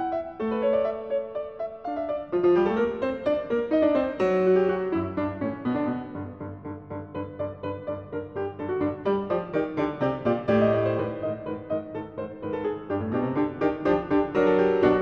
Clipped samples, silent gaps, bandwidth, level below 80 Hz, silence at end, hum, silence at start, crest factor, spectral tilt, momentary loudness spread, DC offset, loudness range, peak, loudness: under 0.1%; none; 6.6 kHz; -54 dBFS; 0 s; none; 0 s; 16 dB; -9 dB/octave; 13 LU; under 0.1%; 8 LU; -8 dBFS; -26 LUFS